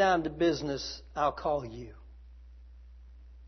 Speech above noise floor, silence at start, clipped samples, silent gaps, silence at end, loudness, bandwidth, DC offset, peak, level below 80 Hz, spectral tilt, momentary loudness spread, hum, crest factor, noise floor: 21 dB; 0 s; under 0.1%; none; 0 s; -31 LUFS; 6.4 kHz; under 0.1%; -14 dBFS; -50 dBFS; -5 dB/octave; 19 LU; none; 20 dB; -51 dBFS